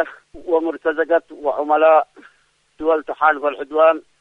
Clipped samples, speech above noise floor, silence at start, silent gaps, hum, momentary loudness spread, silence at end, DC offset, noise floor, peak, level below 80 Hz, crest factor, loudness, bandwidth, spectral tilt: under 0.1%; 42 dB; 0 s; none; none; 10 LU; 0.2 s; under 0.1%; -59 dBFS; -2 dBFS; -58 dBFS; 16 dB; -18 LUFS; 4 kHz; -5 dB/octave